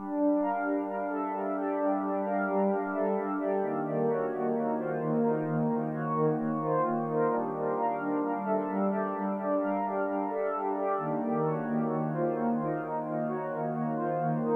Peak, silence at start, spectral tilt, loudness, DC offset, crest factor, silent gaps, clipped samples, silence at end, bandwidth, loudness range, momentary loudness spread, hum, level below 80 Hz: -16 dBFS; 0 s; -11 dB/octave; -30 LUFS; under 0.1%; 14 dB; none; under 0.1%; 0 s; 3.5 kHz; 1 LU; 4 LU; none; -76 dBFS